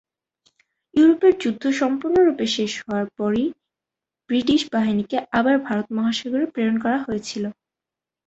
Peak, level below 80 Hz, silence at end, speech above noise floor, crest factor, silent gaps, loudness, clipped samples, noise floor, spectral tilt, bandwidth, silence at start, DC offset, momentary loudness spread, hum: -6 dBFS; -58 dBFS; 0.75 s; 68 dB; 16 dB; none; -21 LUFS; under 0.1%; -88 dBFS; -5 dB/octave; 8.2 kHz; 0.95 s; under 0.1%; 9 LU; none